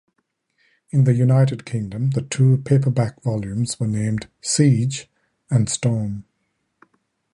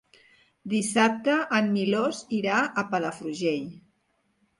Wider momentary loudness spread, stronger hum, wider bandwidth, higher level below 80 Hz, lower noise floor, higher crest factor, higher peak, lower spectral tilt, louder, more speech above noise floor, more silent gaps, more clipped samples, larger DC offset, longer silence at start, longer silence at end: about the same, 10 LU vs 9 LU; neither; about the same, 11 kHz vs 11.5 kHz; first, -52 dBFS vs -72 dBFS; about the same, -72 dBFS vs -72 dBFS; about the same, 18 dB vs 18 dB; first, -4 dBFS vs -8 dBFS; first, -6 dB/octave vs -4.5 dB/octave; first, -20 LUFS vs -26 LUFS; first, 53 dB vs 46 dB; neither; neither; neither; first, 0.95 s vs 0.65 s; first, 1.15 s vs 0.8 s